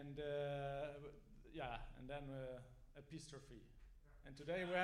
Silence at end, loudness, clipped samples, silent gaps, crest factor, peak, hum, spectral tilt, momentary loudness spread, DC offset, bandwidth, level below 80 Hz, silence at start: 0 s; -50 LUFS; under 0.1%; none; 24 dB; -26 dBFS; none; -5.5 dB/octave; 19 LU; under 0.1%; 14 kHz; -62 dBFS; 0 s